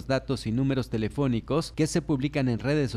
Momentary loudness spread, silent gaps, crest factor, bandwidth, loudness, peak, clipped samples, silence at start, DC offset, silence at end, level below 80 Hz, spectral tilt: 3 LU; none; 14 dB; 14 kHz; -27 LUFS; -12 dBFS; under 0.1%; 0 s; under 0.1%; 0 s; -46 dBFS; -6.5 dB/octave